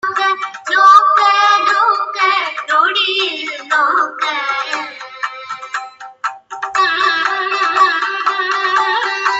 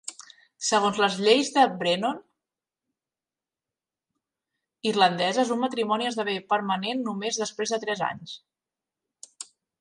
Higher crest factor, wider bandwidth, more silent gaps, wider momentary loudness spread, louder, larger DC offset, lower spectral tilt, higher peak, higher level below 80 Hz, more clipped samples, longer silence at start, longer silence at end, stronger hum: second, 14 dB vs 20 dB; second, 8 kHz vs 11.5 kHz; neither; second, 14 LU vs 18 LU; first, -14 LUFS vs -25 LUFS; neither; second, 0 dB/octave vs -3 dB/octave; first, 0 dBFS vs -6 dBFS; first, -66 dBFS vs -76 dBFS; neither; about the same, 0.05 s vs 0.05 s; second, 0 s vs 0.35 s; neither